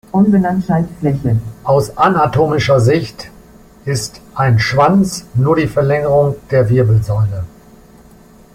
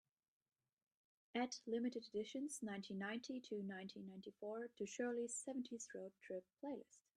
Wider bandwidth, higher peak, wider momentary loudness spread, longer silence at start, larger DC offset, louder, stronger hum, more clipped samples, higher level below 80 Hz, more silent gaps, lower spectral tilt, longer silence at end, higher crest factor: first, 15.5 kHz vs 12.5 kHz; first, 0 dBFS vs -30 dBFS; about the same, 10 LU vs 9 LU; second, 0.15 s vs 1.35 s; neither; first, -14 LUFS vs -48 LUFS; neither; neither; first, -40 dBFS vs -90 dBFS; neither; first, -7 dB/octave vs -4 dB/octave; first, 1.05 s vs 0.15 s; about the same, 14 dB vs 18 dB